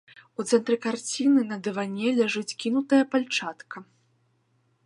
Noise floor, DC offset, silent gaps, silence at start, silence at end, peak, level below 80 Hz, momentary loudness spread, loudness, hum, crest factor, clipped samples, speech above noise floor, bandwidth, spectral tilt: -69 dBFS; under 0.1%; none; 0.4 s; 1 s; -8 dBFS; -82 dBFS; 15 LU; -25 LUFS; none; 18 dB; under 0.1%; 44 dB; 11.5 kHz; -4 dB/octave